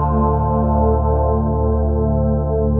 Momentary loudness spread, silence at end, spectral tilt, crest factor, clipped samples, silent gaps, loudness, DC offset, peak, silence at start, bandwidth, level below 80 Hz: 2 LU; 0 s; -14.5 dB/octave; 12 dB; under 0.1%; none; -17 LUFS; under 0.1%; -4 dBFS; 0 s; 1.7 kHz; -20 dBFS